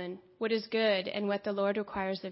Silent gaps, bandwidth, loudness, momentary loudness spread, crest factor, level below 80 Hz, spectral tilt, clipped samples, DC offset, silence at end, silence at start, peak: none; 5.8 kHz; -32 LUFS; 6 LU; 14 dB; -68 dBFS; -9 dB/octave; under 0.1%; under 0.1%; 0 s; 0 s; -18 dBFS